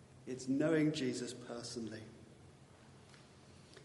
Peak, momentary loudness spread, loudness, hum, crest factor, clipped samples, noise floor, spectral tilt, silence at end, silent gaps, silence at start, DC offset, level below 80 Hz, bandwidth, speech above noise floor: -22 dBFS; 27 LU; -38 LUFS; none; 20 dB; under 0.1%; -60 dBFS; -5.5 dB/octave; 0 s; none; 0 s; under 0.1%; -78 dBFS; 11.5 kHz; 23 dB